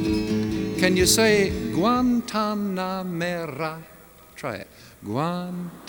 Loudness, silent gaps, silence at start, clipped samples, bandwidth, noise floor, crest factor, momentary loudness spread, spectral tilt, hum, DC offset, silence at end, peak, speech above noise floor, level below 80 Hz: -23 LUFS; none; 0 s; under 0.1%; over 20 kHz; -46 dBFS; 22 dB; 16 LU; -4 dB/octave; none; under 0.1%; 0 s; -2 dBFS; 23 dB; -44 dBFS